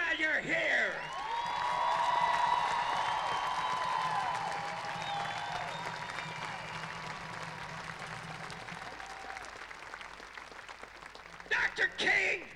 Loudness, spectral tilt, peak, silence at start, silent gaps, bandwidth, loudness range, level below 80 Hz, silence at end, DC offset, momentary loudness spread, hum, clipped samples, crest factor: -33 LUFS; -2.5 dB/octave; -16 dBFS; 0 s; none; 14.5 kHz; 12 LU; -64 dBFS; 0 s; under 0.1%; 16 LU; none; under 0.1%; 18 dB